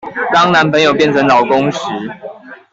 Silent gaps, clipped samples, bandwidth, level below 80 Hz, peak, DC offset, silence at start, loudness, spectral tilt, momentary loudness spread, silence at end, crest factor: none; under 0.1%; 7.8 kHz; -52 dBFS; -2 dBFS; under 0.1%; 0.05 s; -11 LUFS; -5 dB/octave; 16 LU; 0.15 s; 12 dB